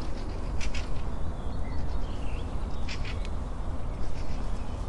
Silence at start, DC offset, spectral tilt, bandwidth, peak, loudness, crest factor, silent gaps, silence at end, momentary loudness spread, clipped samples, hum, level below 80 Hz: 0 s; under 0.1%; -6 dB/octave; 11 kHz; -16 dBFS; -36 LUFS; 12 dB; none; 0 s; 2 LU; under 0.1%; none; -34 dBFS